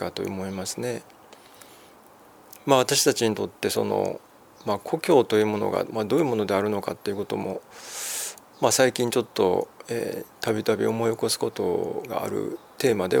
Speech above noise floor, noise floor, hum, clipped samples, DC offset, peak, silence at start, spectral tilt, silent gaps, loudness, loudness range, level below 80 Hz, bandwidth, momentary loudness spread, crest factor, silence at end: 27 dB; -51 dBFS; none; under 0.1%; under 0.1%; -4 dBFS; 0 s; -4 dB/octave; none; -25 LUFS; 3 LU; -68 dBFS; over 20 kHz; 12 LU; 22 dB; 0 s